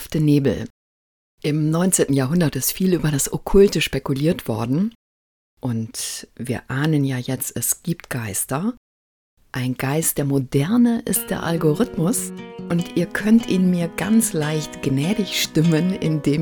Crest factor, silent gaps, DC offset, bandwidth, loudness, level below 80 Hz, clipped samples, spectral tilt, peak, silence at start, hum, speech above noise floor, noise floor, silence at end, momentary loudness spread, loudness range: 18 dB; 0.70-1.38 s, 4.95-5.57 s, 8.77-9.37 s; under 0.1%; 18 kHz; -20 LUFS; -42 dBFS; under 0.1%; -5 dB/octave; -2 dBFS; 0 s; none; over 70 dB; under -90 dBFS; 0 s; 10 LU; 5 LU